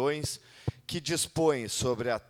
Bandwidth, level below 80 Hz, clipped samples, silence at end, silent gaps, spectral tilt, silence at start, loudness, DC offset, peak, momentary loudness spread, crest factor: 17.5 kHz; -56 dBFS; under 0.1%; 0.1 s; none; -4 dB/octave; 0 s; -31 LUFS; under 0.1%; -14 dBFS; 10 LU; 18 dB